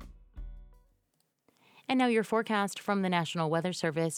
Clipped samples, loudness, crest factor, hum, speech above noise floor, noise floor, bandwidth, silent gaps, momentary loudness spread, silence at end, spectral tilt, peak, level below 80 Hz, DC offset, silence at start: under 0.1%; -30 LUFS; 20 dB; none; 47 dB; -77 dBFS; 16 kHz; none; 22 LU; 0 s; -5 dB/octave; -12 dBFS; -54 dBFS; under 0.1%; 0 s